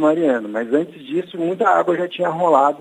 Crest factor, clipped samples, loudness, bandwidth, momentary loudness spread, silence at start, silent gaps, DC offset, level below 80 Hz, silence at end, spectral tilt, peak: 18 dB; under 0.1%; -19 LUFS; 10 kHz; 9 LU; 0 s; none; under 0.1%; -78 dBFS; 0.05 s; -6.5 dB/octave; 0 dBFS